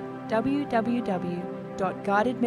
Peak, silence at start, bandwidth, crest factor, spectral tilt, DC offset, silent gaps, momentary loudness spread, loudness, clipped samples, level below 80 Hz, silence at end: -10 dBFS; 0 s; 11.5 kHz; 18 dB; -7 dB/octave; under 0.1%; none; 7 LU; -28 LUFS; under 0.1%; -60 dBFS; 0 s